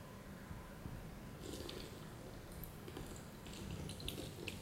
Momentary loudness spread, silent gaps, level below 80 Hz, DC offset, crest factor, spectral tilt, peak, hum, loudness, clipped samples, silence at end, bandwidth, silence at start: 6 LU; none; -58 dBFS; under 0.1%; 22 dB; -4.5 dB/octave; -28 dBFS; none; -50 LUFS; under 0.1%; 0 s; 16 kHz; 0 s